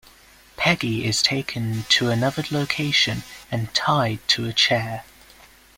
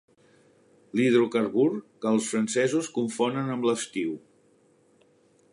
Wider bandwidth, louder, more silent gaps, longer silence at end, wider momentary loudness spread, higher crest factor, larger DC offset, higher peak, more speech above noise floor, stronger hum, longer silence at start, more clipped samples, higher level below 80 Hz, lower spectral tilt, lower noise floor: first, 16.5 kHz vs 11.5 kHz; first, -21 LUFS vs -26 LUFS; neither; second, 0.75 s vs 1.35 s; about the same, 9 LU vs 9 LU; about the same, 20 dB vs 18 dB; neither; first, -4 dBFS vs -10 dBFS; second, 28 dB vs 37 dB; neither; second, 0.6 s vs 0.95 s; neither; first, -52 dBFS vs -76 dBFS; second, -3.5 dB/octave vs -5 dB/octave; second, -51 dBFS vs -62 dBFS